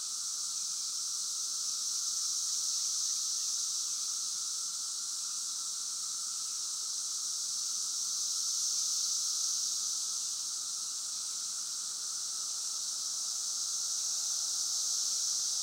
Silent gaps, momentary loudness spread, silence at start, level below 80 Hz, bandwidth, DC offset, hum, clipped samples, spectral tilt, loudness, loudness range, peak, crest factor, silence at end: none; 5 LU; 0 s; under -90 dBFS; 16 kHz; under 0.1%; none; under 0.1%; 4 dB/octave; -32 LUFS; 3 LU; -20 dBFS; 14 dB; 0 s